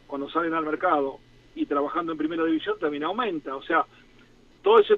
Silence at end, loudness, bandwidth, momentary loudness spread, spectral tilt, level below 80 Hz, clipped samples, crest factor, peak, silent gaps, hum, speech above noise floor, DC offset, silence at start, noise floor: 0 s; -26 LUFS; 5.2 kHz; 9 LU; -6.5 dB/octave; -60 dBFS; under 0.1%; 20 dB; -6 dBFS; none; none; 30 dB; under 0.1%; 0.1 s; -54 dBFS